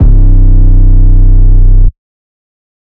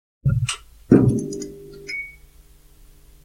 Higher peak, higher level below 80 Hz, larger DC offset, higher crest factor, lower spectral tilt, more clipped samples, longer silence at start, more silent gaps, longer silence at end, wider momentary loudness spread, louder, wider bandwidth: about the same, 0 dBFS vs 0 dBFS; first, -4 dBFS vs -42 dBFS; neither; second, 4 dB vs 22 dB; first, -12.5 dB/octave vs -6.5 dB/octave; first, 30% vs under 0.1%; second, 0 s vs 0.25 s; neither; second, 1 s vs 1.15 s; second, 2 LU vs 20 LU; first, -9 LUFS vs -21 LUFS; second, 1.1 kHz vs 15.5 kHz